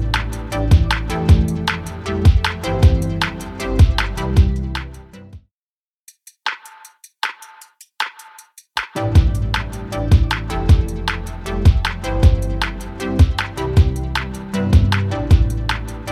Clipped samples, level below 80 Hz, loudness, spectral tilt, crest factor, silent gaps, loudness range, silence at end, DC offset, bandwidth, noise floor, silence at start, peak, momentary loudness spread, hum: under 0.1%; -20 dBFS; -18 LUFS; -6 dB/octave; 16 dB; 5.53-6.06 s; 11 LU; 0 s; under 0.1%; 14 kHz; under -90 dBFS; 0 s; 0 dBFS; 11 LU; none